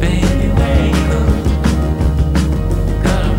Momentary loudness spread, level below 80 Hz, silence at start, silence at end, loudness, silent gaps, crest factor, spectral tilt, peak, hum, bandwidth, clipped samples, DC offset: 3 LU; -16 dBFS; 0 s; 0 s; -15 LUFS; none; 12 dB; -7 dB/octave; 0 dBFS; none; 16 kHz; under 0.1%; under 0.1%